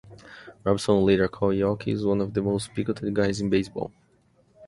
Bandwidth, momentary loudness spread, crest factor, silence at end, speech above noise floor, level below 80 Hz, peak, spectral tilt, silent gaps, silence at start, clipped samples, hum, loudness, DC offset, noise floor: 11.5 kHz; 12 LU; 20 dB; 0 s; 38 dB; -50 dBFS; -6 dBFS; -6.5 dB/octave; none; 0.05 s; under 0.1%; none; -25 LUFS; under 0.1%; -62 dBFS